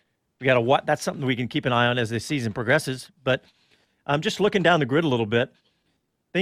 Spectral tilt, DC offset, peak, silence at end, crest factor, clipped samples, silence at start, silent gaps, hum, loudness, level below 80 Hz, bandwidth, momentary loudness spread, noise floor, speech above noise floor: -5.5 dB/octave; under 0.1%; -4 dBFS; 0 s; 20 dB; under 0.1%; 0.4 s; none; none; -23 LUFS; -60 dBFS; 15 kHz; 8 LU; -72 dBFS; 49 dB